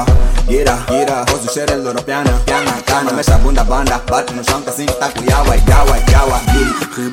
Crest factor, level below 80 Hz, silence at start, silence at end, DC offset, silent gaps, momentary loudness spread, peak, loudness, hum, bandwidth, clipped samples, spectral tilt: 12 dB; -14 dBFS; 0 s; 0 s; under 0.1%; none; 5 LU; 0 dBFS; -14 LUFS; none; 17 kHz; under 0.1%; -4.5 dB/octave